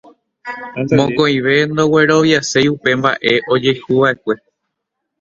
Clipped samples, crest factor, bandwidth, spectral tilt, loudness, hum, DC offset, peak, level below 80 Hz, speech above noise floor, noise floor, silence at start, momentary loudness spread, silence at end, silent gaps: under 0.1%; 16 dB; 7.8 kHz; -5 dB/octave; -14 LUFS; none; under 0.1%; 0 dBFS; -52 dBFS; 62 dB; -76 dBFS; 0.45 s; 13 LU; 0.85 s; none